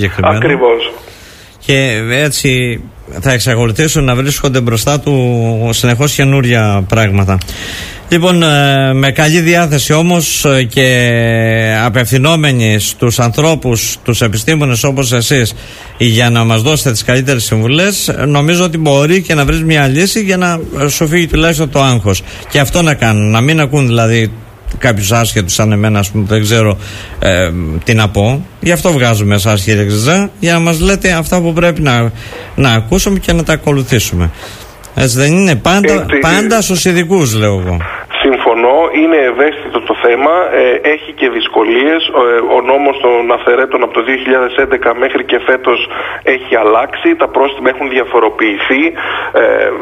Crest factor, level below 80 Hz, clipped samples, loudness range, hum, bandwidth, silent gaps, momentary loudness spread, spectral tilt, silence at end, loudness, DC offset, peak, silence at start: 10 dB; -30 dBFS; under 0.1%; 2 LU; none; 15.5 kHz; none; 5 LU; -5 dB/octave; 0 s; -10 LUFS; under 0.1%; 0 dBFS; 0 s